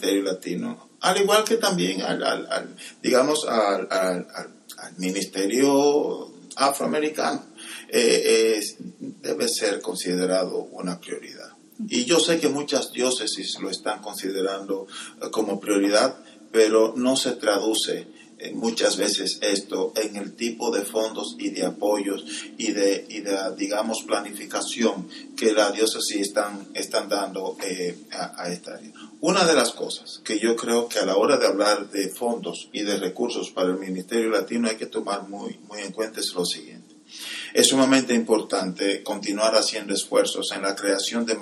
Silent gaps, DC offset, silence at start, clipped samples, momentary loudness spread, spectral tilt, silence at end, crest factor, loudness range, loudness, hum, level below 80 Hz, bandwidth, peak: none; under 0.1%; 0 s; under 0.1%; 14 LU; -3 dB/octave; 0 s; 24 dB; 5 LU; -24 LUFS; none; -80 dBFS; 14 kHz; 0 dBFS